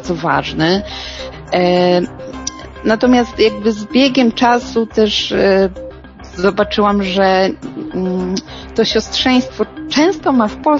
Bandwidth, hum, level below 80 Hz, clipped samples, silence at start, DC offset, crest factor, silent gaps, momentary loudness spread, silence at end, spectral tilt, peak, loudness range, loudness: 7.6 kHz; none; -38 dBFS; under 0.1%; 0 s; under 0.1%; 14 dB; none; 13 LU; 0 s; -5 dB/octave; 0 dBFS; 3 LU; -14 LUFS